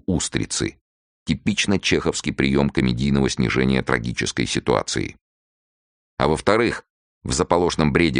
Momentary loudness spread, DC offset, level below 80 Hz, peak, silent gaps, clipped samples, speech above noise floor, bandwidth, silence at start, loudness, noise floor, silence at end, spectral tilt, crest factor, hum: 8 LU; under 0.1%; -38 dBFS; 0 dBFS; 0.81-1.26 s, 5.21-6.17 s, 6.90-7.21 s; under 0.1%; over 70 dB; 10 kHz; 0.1 s; -21 LUFS; under -90 dBFS; 0 s; -4.5 dB/octave; 20 dB; none